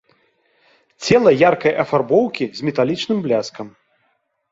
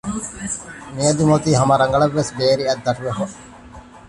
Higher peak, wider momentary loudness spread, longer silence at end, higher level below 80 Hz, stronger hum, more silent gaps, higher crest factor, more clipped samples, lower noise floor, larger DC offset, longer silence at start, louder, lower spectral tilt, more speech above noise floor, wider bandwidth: about the same, -2 dBFS vs -2 dBFS; first, 15 LU vs 12 LU; first, 0.8 s vs 0.1 s; second, -58 dBFS vs -46 dBFS; neither; neither; about the same, 18 dB vs 16 dB; neither; first, -67 dBFS vs -40 dBFS; neither; first, 1 s vs 0.05 s; about the same, -17 LUFS vs -19 LUFS; about the same, -5.5 dB/octave vs -5 dB/octave; first, 50 dB vs 22 dB; second, 7.8 kHz vs 11.5 kHz